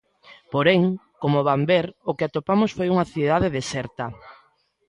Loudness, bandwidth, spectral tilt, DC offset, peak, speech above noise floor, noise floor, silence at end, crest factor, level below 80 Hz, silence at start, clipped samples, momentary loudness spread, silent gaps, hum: -22 LUFS; 11 kHz; -6.5 dB/octave; under 0.1%; -6 dBFS; 40 dB; -62 dBFS; 0.55 s; 18 dB; -50 dBFS; 0.3 s; under 0.1%; 10 LU; none; none